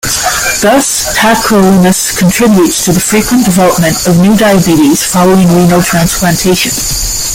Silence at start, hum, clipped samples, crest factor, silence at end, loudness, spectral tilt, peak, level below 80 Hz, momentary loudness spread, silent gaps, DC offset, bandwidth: 0.05 s; none; under 0.1%; 8 dB; 0 s; -7 LUFS; -4 dB/octave; 0 dBFS; -28 dBFS; 3 LU; none; under 0.1%; 17 kHz